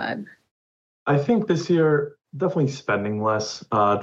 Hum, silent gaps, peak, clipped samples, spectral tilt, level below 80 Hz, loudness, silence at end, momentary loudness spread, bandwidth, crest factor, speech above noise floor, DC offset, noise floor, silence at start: none; 0.51-1.06 s; -8 dBFS; under 0.1%; -6.5 dB/octave; -66 dBFS; -23 LUFS; 0 s; 12 LU; 7.8 kHz; 16 dB; over 68 dB; under 0.1%; under -90 dBFS; 0 s